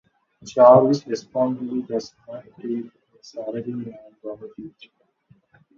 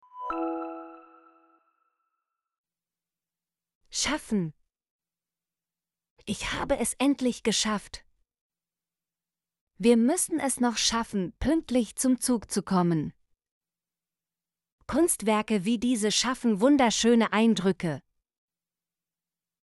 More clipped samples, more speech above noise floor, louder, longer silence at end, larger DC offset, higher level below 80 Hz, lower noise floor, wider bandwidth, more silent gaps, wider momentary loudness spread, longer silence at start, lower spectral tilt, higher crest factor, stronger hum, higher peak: neither; second, 38 dB vs over 65 dB; first, -20 LUFS vs -26 LUFS; second, 1.1 s vs 1.65 s; neither; second, -68 dBFS vs -54 dBFS; second, -59 dBFS vs under -90 dBFS; second, 7.2 kHz vs 12 kHz; second, none vs 2.58-2.64 s, 3.75-3.81 s, 4.91-4.99 s, 6.10-6.17 s, 8.41-8.50 s, 9.61-9.67 s, 13.51-13.61 s, 14.72-14.78 s; first, 26 LU vs 13 LU; first, 0.45 s vs 0.15 s; first, -7 dB/octave vs -4 dB/octave; about the same, 22 dB vs 20 dB; neither; first, 0 dBFS vs -8 dBFS